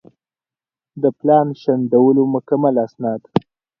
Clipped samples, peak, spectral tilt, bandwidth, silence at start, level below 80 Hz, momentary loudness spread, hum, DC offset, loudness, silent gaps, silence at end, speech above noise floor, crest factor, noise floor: under 0.1%; 0 dBFS; -10.5 dB/octave; 5.8 kHz; 0.95 s; -58 dBFS; 9 LU; none; under 0.1%; -17 LUFS; none; 0.4 s; over 74 dB; 18 dB; under -90 dBFS